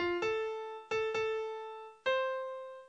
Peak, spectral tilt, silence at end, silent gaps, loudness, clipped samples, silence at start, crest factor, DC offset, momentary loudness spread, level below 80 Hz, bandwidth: -22 dBFS; -4 dB/octave; 0 s; none; -36 LUFS; under 0.1%; 0 s; 14 dB; under 0.1%; 10 LU; -70 dBFS; 8.4 kHz